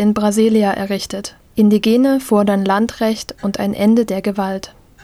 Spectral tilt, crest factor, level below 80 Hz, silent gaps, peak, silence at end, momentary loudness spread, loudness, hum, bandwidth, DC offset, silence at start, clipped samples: -6 dB/octave; 14 dB; -48 dBFS; none; -2 dBFS; 0.35 s; 11 LU; -16 LUFS; none; 14.5 kHz; under 0.1%; 0 s; under 0.1%